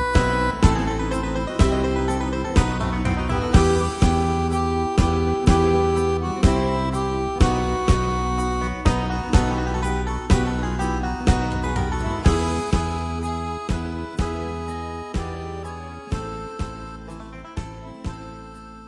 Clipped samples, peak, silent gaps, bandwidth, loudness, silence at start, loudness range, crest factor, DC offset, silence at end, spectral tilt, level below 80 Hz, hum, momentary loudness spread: under 0.1%; 0 dBFS; none; 11.5 kHz; -22 LUFS; 0 s; 10 LU; 20 dB; under 0.1%; 0 s; -6 dB/octave; -28 dBFS; none; 15 LU